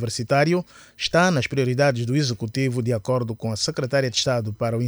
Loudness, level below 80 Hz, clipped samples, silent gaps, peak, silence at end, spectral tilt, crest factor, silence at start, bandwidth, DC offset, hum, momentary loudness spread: -22 LUFS; -54 dBFS; under 0.1%; none; -6 dBFS; 0 s; -5 dB/octave; 16 dB; 0 s; over 20 kHz; under 0.1%; none; 6 LU